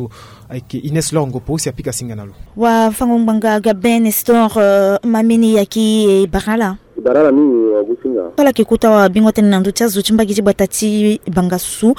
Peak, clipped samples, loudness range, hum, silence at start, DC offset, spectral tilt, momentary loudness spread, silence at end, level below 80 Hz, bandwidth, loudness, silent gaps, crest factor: 0 dBFS; under 0.1%; 3 LU; none; 0 s; under 0.1%; -5.5 dB/octave; 9 LU; 0 s; -40 dBFS; 18 kHz; -13 LUFS; none; 12 dB